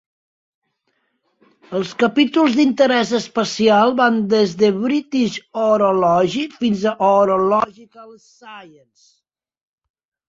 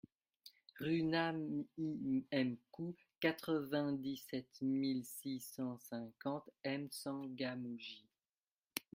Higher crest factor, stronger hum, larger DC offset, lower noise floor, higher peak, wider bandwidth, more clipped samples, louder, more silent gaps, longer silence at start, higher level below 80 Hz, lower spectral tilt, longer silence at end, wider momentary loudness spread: second, 16 dB vs 22 dB; neither; neither; second, -69 dBFS vs under -90 dBFS; first, -2 dBFS vs -20 dBFS; second, 8 kHz vs 16 kHz; neither; first, -17 LUFS vs -42 LUFS; second, none vs 8.52-8.57 s; first, 1.7 s vs 0.45 s; first, -60 dBFS vs -82 dBFS; about the same, -5 dB/octave vs -5.5 dB/octave; first, 1.65 s vs 0.15 s; second, 7 LU vs 11 LU